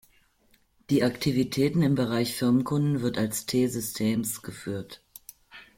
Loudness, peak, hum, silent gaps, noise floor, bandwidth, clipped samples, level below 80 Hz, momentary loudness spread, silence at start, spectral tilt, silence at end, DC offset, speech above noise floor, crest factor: -27 LUFS; -10 dBFS; none; none; -65 dBFS; 16.5 kHz; under 0.1%; -58 dBFS; 15 LU; 0.9 s; -5.5 dB/octave; 0.15 s; under 0.1%; 39 dB; 16 dB